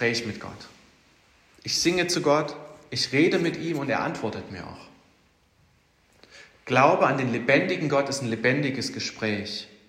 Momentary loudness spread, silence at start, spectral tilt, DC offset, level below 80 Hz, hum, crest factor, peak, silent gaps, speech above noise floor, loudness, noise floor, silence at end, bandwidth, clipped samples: 17 LU; 0 s; -4.5 dB/octave; under 0.1%; -64 dBFS; none; 22 dB; -4 dBFS; none; 38 dB; -24 LUFS; -63 dBFS; 0.2 s; 15.5 kHz; under 0.1%